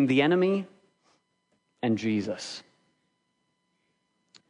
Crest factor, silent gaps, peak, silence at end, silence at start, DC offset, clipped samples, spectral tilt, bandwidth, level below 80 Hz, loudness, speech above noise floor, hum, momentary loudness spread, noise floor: 20 dB; none; -10 dBFS; 1.9 s; 0 s; under 0.1%; under 0.1%; -6 dB/octave; 10.5 kHz; -78 dBFS; -27 LUFS; 50 dB; none; 18 LU; -76 dBFS